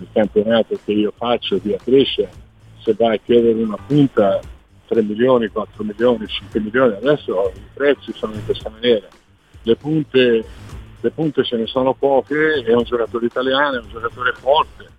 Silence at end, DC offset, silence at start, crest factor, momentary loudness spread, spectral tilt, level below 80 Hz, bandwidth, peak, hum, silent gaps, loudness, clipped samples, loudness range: 0.15 s; under 0.1%; 0 s; 16 dB; 10 LU; -7 dB/octave; -46 dBFS; 9 kHz; -2 dBFS; none; none; -18 LUFS; under 0.1%; 2 LU